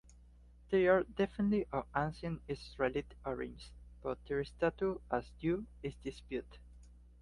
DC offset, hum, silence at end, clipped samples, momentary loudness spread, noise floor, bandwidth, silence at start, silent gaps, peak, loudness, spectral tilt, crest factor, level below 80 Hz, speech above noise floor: under 0.1%; 60 Hz at -55 dBFS; 0.25 s; under 0.1%; 14 LU; -60 dBFS; 11.5 kHz; 0.7 s; none; -16 dBFS; -37 LUFS; -7.5 dB/octave; 20 dB; -56 dBFS; 23 dB